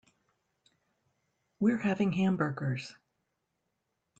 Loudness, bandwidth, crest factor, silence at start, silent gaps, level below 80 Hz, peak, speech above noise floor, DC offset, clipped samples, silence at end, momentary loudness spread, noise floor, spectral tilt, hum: -31 LUFS; 8 kHz; 18 dB; 1.6 s; none; -72 dBFS; -16 dBFS; 52 dB; under 0.1%; under 0.1%; 1.3 s; 9 LU; -82 dBFS; -7.5 dB/octave; none